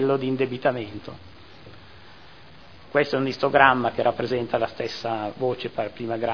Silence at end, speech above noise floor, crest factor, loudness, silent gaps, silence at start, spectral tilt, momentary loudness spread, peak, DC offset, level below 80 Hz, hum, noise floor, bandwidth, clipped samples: 0 s; 24 dB; 24 dB; -24 LUFS; none; 0 s; -6.5 dB/octave; 14 LU; 0 dBFS; 0.4%; -58 dBFS; none; -48 dBFS; 5.4 kHz; under 0.1%